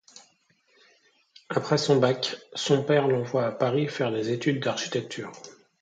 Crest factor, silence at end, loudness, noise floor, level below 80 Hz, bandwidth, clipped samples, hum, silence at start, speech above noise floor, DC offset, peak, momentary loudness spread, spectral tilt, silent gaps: 18 dB; 0.3 s; -26 LUFS; -66 dBFS; -70 dBFS; 9.2 kHz; under 0.1%; none; 0.15 s; 40 dB; under 0.1%; -8 dBFS; 9 LU; -5 dB/octave; none